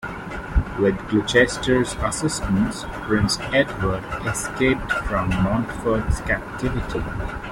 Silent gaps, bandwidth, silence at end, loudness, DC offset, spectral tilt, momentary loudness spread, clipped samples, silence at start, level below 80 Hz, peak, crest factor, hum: none; 16.5 kHz; 0 s; -22 LUFS; under 0.1%; -5 dB/octave; 8 LU; under 0.1%; 0 s; -32 dBFS; -4 dBFS; 18 dB; none